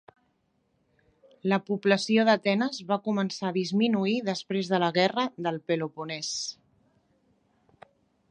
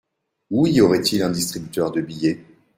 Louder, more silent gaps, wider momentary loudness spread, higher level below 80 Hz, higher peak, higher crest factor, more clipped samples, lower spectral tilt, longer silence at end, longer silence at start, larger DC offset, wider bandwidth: second, -27 LUFS vs -20 LUFS; neither; about the same, 9 LU vs 9 LU; second, -76 dBFS vs -54 dBFS; second, -8 dBFS vs -2 dBFS; about the same, 20 dB vs 18 dB; neither; about the same, -5 dB/octave vs -5 dB/octave; first, 1.75 s vs 0.35 s; first, 1.45 s vs 0.5 s; neither; second, 10 kHz vs 16 kHz